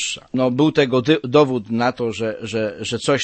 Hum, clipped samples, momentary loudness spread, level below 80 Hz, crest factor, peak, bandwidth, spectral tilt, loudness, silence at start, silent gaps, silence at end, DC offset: none; under 0.1%; 8 LU; -56 dBFS; 18 dB; -2 dBFS; 8.8 kHz; -5 dB/octave; -19 LUFS; 0 s; none; 0 s; under 0.1%